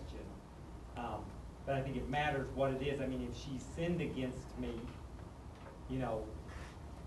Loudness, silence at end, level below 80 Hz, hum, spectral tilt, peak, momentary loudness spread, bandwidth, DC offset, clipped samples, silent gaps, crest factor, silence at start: -41 LUFS; 0 s; -52 dBFS; none; -6.5 dB/octave; -22 dBFS; 15 LU; 12 kHz; under 0.1%; under 0.1%; none; 18 dB; 0 s